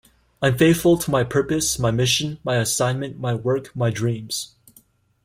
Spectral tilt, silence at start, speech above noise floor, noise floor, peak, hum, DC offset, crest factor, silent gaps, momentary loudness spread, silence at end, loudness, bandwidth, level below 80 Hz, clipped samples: -4.5 dB/octave; 0.4 s; 36 dB; -56 dBFS; -4 dBFS; none; under 0.1%; 16 dB; none; 9 LU; 0.8 s; -21 LUFS; 16.5 kHz; -48 dBFS; under 0.1%